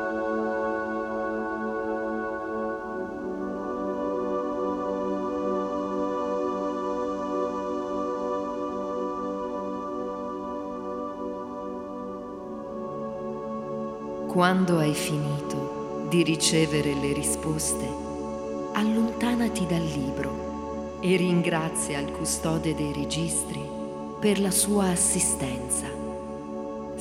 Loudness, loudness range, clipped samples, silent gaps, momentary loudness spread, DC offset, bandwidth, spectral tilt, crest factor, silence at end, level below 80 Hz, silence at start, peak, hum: -28 LUFS; 8 LU; under 0.1%; none; 12 LU; under 0.1%; 16.5 kHz; -4.5 dB/octave; 22 dB; 0 s; -50 dBFS; 0 s; -6 dBFS; none